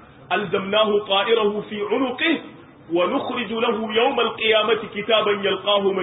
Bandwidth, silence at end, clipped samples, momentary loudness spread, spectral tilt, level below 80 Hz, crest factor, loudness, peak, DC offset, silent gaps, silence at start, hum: 4 kHz; 0 s; under 0.1%; 7 LU; -9 dB/octave; -62 dBFS; 16 dB; -21 LUFS; -4 dBFS; under 0.1%; none; 0 s; none